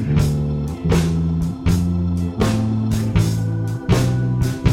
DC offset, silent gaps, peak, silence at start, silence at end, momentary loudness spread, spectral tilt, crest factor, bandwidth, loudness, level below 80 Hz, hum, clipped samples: under 0.1%; none; -2 dBFS; 0 s; 0 s; 4 LU; -7 dB/octave; 16 dB; 16.5 kHz; -19 LUFS; -30 dBFS; none; under 0.1%